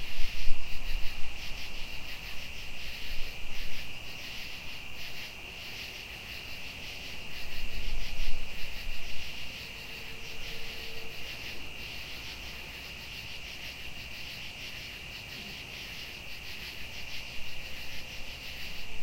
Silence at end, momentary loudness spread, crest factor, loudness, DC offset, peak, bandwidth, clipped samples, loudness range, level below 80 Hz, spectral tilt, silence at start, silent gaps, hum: 0 s; 2 LU; 22 dB; -40 LUFS; under 0.1%; -6 dBFS; 16 kHz; under 0.1%; 1 LU; -40 dBFS; -2.5 dB/octave; 0 s; none; none